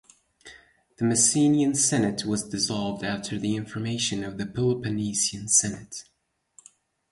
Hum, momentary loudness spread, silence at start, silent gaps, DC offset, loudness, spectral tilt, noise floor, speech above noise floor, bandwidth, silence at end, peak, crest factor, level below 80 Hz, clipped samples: none; 11 LU; 0.45 s; none; under 0.1%; -24 LUFS; -3.5 dB/octave; -59 dBFS; 33 dB; 11.5 kHz; 1.1 s; -6 dBFS; 20 dB; -58 dBFS; under 0.1%